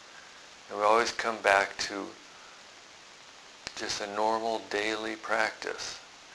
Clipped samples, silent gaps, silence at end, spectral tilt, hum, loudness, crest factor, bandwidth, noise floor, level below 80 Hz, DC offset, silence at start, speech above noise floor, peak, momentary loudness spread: under 0.1%; none; 0 s; -1.5 dB/octave; none; -29 LUFS; 24 dB; 11 kHz; -52 dBFS; -68 dBFS; under 0.1%; 0 s; 22 dB; -8 dBFS; 24 LU